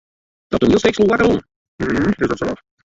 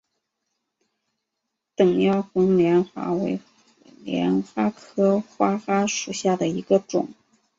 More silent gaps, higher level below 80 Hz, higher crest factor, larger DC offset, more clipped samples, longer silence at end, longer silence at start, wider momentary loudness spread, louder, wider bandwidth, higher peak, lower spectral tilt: first, 1.56-1.78 s vs none; first, -40 dBFS vs -64 dBFS; about the same, 16 dB vs 18 dB; neither; neither; about the same, 0.35 s vs 0.45 s; second, 0.5 s vs 1.8 s; about the same, 10 LU vs 9 LU; first, -17 LUFS vs -22 LUFS; about the same, 7.8 kHz vs 7.8 kHz; first, -2 dBFS vs -6 dBFS; about the same, -6 dB/octave vs -6 dB/octave